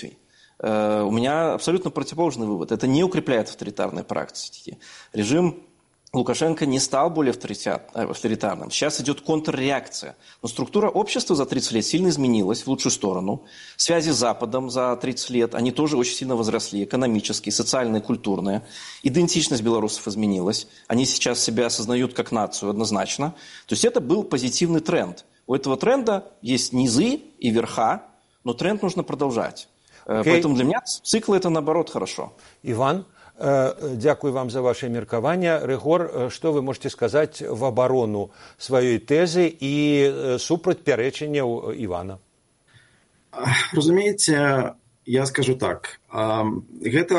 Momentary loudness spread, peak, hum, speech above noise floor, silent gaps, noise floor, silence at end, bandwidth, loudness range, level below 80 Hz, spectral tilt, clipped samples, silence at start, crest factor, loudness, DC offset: 10 LU; -4 dBFS; none; 40 dB; none; -62 dBFS; 0 s; 11.5 kHz; 3 LU; -58 dBFS; -4.5 dB/octave; under 0.1%; 0 s; 20 dB; -23 LUFS; under 0.1%